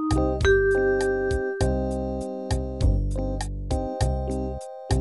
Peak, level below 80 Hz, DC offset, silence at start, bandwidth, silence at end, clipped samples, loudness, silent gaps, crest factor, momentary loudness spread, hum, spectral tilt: -8 dBFS; -30 dBFS; 0.1%; 0 s; 12 kHz; 0 s; under 0.1%; -25 LUFS; none; 16 dB; 10 LU; none; -6.5 dB/octave